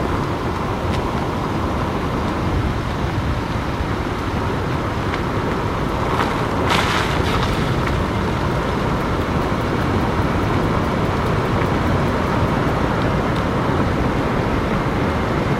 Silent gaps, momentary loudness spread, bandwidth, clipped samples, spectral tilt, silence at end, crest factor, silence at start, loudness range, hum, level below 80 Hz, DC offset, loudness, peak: none; 4 LU; 16 kHz; under 0.1%; -6.5 dB/octave; 0 s; 18 dB; 0 s; 3 LU; none; -28 dBFS; under 0.1%; -20 LUFS; 0 dBFS